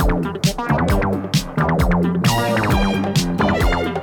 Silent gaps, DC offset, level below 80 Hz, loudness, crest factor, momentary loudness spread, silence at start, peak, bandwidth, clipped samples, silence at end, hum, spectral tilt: none; under 0.1%; -26 dBFS; -18 LUFS; 12 dB; 3 LU; 0 s; -6 dBFS; 19.5 kHz; under 0.1%; 0 s; none; -5.5 dB/octave